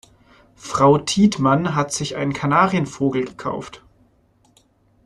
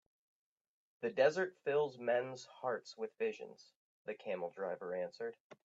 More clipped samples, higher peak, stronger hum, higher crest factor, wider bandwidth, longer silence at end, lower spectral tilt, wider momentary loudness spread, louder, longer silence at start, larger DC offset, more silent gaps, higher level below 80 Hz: neither; first, -2 dBFS vs -18 dBFS; neither; about the same, 18 dB vs 22 dB; first, 12 kHz vs 7.8 kHz; first, 1.3 s vs 0.1 s; about the same, -5.5 dB/octave vs -5 dB/octave; about the same, 12 LU vs 14 LU; first, -19 LUFS vs -39 LUFS; second, 0.65 s vs 1 s; neither; second, none vs 3.76-4.05 s, 5.40-5.50 s; first, -52 dBFS vs under -90 dBFS